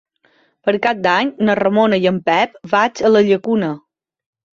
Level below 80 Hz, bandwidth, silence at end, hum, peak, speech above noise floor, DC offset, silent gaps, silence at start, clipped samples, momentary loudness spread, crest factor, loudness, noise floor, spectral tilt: -58 dBFS; 7.4 kHz; 0.8 s; none; -2 dBFS; 43 dB; under 0.1%; none; 0.65 s; under 0.1%; 6 LU; 14 dB; -16 LUFS; -58 dBFS; -6 dB/octave